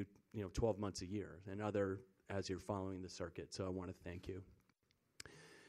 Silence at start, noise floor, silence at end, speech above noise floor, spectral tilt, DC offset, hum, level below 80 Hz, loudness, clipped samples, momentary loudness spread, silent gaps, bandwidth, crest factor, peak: 0 s; -80 dBFS; 0 s; 36 dB; -6 dB/octave; under 0.1%; none; -62 dBFS; -46 LUFS; under 0.1%; 12 LU; none; 14 kHz; 22 dB; -24 dBFS